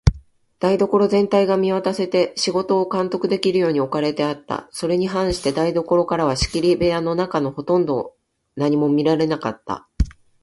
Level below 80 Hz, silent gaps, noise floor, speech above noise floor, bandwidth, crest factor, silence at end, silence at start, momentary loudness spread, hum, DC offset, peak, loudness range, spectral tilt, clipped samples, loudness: -34 dBFS; none; -42 dBFS; 22 dB; 11.5 kHz; 20 dB; 0.3 s; 0.05 s; 9 LU; none; under 0.1%; 0 dBFS; 2 LU; -6 dB/octave; under 0.1%; -20 LUFS